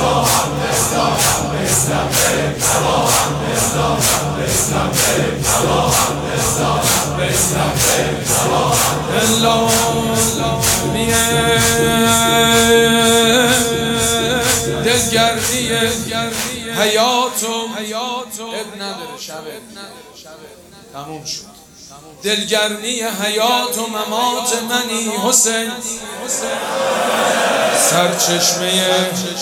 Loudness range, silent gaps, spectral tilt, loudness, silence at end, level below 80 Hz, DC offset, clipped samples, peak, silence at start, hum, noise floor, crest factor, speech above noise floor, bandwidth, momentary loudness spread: 10 LU; none; -2.5 dB/octave; -14 LUFS; 0 s; -38 dBFS; under 0.1%; under 0.1%; 0 dBFS; 0 s; none; -40 dBFS; 16 dB; 22 dB; 19 kHz; 12 LU